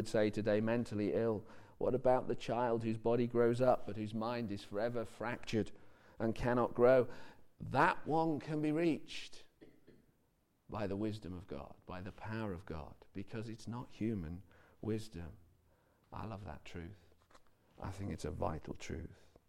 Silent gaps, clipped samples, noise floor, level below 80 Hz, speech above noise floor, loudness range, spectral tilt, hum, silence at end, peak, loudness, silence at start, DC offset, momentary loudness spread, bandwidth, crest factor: none; under 0.1%; -76 dBFS; -58 dBFS; 39 dB; 12 LU; -7 dB/octave; none; 0.35 s; -18 dBFS; -37 LUFS; 0 s; under 0.1%; 17 LU; 15.5 kHz; 20 dB